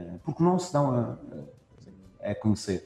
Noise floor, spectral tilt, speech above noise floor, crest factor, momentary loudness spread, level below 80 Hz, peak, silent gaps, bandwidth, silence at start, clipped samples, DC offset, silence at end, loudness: -52 dBFS; -7 dB/octave; 26 dB; 18 dB; 16 LU; -60 dBFS; -12 dBFS; none; 12 kHz; 0 s; under 0.1%; under 0.1%; 0 s; -28 LUFS